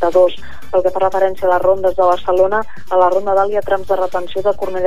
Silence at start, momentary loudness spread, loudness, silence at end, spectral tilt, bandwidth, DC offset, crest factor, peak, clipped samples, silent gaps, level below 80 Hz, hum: 0 s; 5 LU; -15 LUFS; 0 s; -6 dB/octave; 15 kHz; 9%; 14 dB; -2 dBFS; under 0.1%; none; -44 dBFS; none